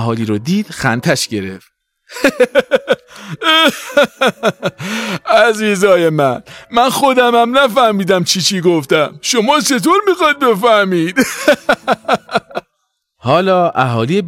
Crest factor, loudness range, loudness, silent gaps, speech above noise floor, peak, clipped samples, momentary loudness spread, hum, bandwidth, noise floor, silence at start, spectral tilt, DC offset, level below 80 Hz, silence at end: 14 dB; 3 LU; -13 LUFS; none; 56 dB; 0 dBFS; under 0.1%; 9 LU; none; 16.5 kHz; -68 dBFS; 0 s; -4 dB/octave; under 0.1%; -52 dBFS; 0 s